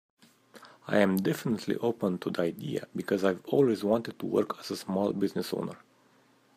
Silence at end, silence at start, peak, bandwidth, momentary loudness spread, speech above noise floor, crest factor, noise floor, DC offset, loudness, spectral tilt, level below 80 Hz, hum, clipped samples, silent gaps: 0.8 s; 0.55 s; -10 dBFS; 15.5 kHz; 10 LU; 35 dB; 20 dB; -64 dBFS; under 0.1%; -30 LUFS; -6.5 dB/octave; -74 dBFS; none; under 0.1%; none